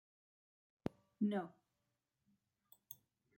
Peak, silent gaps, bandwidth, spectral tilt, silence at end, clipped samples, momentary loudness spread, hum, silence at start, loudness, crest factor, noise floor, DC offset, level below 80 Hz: -24 dBFS; none; 16.5 kHz; -7.5 dB/octave; 0.45 s; under 0.1%; 17 LU; none; 0.85 s; -44 LUFS; 26 dB; -88 dBFS; under 0.1%; -80 dBFS